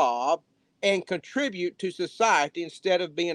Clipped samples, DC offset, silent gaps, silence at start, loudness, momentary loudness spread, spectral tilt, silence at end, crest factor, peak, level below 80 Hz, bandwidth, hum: under 0.1%; under 0.1%; none; 0 s; -27 LUFS; 9 LU; -3.5 dB/octave; 0 s; 18 dB; -8 dBFS; -78 dBFS; 10.5 kHz; none